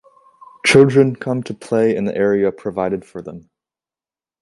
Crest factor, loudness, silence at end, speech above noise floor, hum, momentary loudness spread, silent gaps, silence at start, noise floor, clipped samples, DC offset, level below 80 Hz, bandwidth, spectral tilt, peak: 18 dB; -16 LUFS; 1.05 s; over 74 dB; none; 16 LU; none; 0.65 s; under -90 dBFS; under 0.1%; under 0.1%; -56 dBFS; 11.5 kHz; -6 dB/octave; 0 dBFS